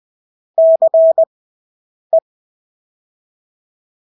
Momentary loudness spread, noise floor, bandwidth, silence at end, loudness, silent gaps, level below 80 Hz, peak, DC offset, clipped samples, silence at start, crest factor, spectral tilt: 8 LU; under -90 dBFS; 1 kHz; 2 s; -13 LUFS; 1.27-2.10 s; -86 dBFS; -4 dBFS; under 0.1%; under 0.1%; 0.6 s; 12 dB; -9 dB/octave